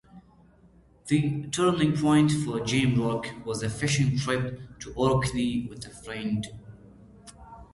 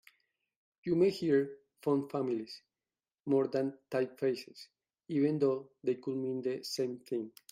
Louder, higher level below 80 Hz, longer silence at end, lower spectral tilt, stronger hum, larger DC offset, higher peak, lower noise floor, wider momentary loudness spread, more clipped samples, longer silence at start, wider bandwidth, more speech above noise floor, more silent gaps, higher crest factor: first, -26 LUFS vs -34 LUFS; first, -50 dBFS vs -80 dBFS; second, 0.1 s vs 0.25 s; about the same, -5.5 dB/octave vs -6.5 dB/octave; neither; neither; first, -10 dBFS vs -18 dBFS; second, -57 dBFS vs under -90 dBFS; first, 17 LU vs 12 LU; neither; second, 0.15 s vs 0.85 s; second, 11.5 kHz vs 15.5 kHz; second, 31 dB vs over 57 dB; neither; about the same, 18 dB vs 18 dB